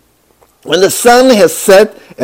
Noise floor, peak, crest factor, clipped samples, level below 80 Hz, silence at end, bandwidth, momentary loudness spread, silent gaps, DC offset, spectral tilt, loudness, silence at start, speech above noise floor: -49 dBFS; 0 dBFS; 8 dB; 6%; -44 dBFS; 0 s; over 20 kHz; 8 LU; none; under 0.1%; -3 dB/octave; -7 LUFS; 0.65 s; 42 dB